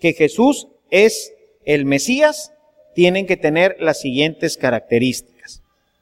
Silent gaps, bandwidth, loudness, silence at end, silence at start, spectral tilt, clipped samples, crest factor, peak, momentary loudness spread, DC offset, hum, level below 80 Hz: none; 16 kHz; -16 LUFS; 0.5 s; 0.05 s; -4.5 dB/octave; under 0.1%; 16 dB; 0 dBFS; 14 LU; under 0.1%; none; -54 dBFS